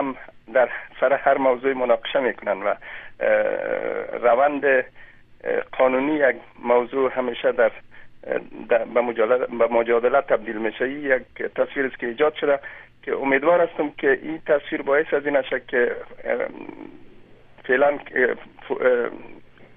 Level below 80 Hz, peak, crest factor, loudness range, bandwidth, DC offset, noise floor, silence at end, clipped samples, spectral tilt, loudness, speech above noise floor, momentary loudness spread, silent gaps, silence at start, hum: -56 dBFS; -4 dBFS; 18 dB; 3 LU; 3.8 kHz; under 0.1%; -47 dBFS; 0 s; under 0.1%; -8.5 dB/octave; -22 LUFS; 25 dB; 11 LU; none; 0 s; none